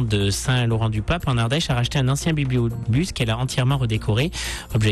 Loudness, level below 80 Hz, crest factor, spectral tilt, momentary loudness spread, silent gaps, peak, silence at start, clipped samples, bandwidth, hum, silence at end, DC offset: -22 LUFS; -36 dBFS; 10 dB; -5.5 dB/octave; 2 LU; none; -10 dBFS; 0 s; under 0.1%; 13 kHz; none; 0 s; under 0.1%